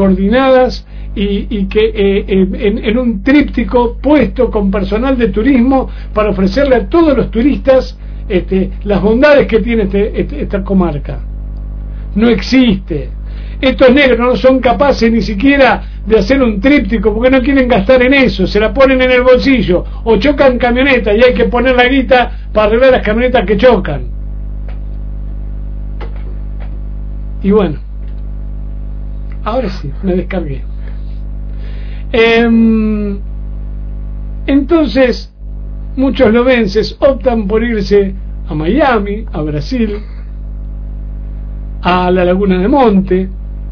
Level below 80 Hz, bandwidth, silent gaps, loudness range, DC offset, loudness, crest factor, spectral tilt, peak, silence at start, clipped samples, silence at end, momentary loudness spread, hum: -22 dBFS; 5.4 kHz; none; 10 LU; under 0.1%; -11 LUFS; 12 dB; -7.5 dB/octave; 0 dBFS; 0 s; 0.5%; 0 s; 17 LU; 50 Hz at -20 dBFS